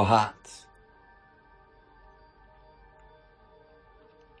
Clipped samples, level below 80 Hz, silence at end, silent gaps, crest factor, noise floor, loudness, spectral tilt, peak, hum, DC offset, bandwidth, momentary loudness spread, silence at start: under 0.1%; -62 dBFS; 3.85 s; none; 26 dB; -58 dBFS; -26 LUFS; -5.5 dB/octave; -8 dBFS; none; under 0.1%; 10.5 kHz; 33 LU; 0 s